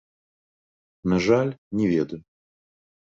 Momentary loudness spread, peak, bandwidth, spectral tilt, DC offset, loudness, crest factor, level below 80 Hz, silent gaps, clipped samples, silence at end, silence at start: 11 LU; -6 dBFS; 7.8 kHz; -7 dB/octave; under 0.1%; -24 LUFS; 20 dB; -54 dBFS; 1.58-1.71 s; under 0.1%; 0.95 s; 1.05 s